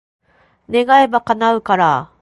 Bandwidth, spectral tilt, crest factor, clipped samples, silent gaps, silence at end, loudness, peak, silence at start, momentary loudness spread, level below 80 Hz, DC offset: 11.5 kHz; -5.5 dB/octave; 16 dB; under 0.1%; none; 0.15 s; -14 LUFS; 0 dBFS; 0.7 s; 6 LU; -56 dBFS; under 0.1%